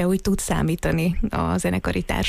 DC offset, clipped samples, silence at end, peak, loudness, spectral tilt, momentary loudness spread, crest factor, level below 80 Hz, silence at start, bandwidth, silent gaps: under 0.1%; under 0.1%; 0 s; -10 dBFS; -23 LUFS; -5.5 dB/octave; 2 LU; 12 dB; -32 dBFS; 0 s; 15.5 kHz; none